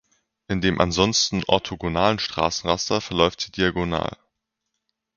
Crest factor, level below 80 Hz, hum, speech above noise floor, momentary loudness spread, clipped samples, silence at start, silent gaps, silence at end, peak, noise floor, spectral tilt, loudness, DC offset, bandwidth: 24 dB; -44 dBFS; none; 58 dB; 7 LU; under 0.1%; 0.5 s; none; 1.05 s; 0 dBFS; -80 dBFS; -4 dB/octave; -22 LUFS; under 0.1%; 7.4 kHz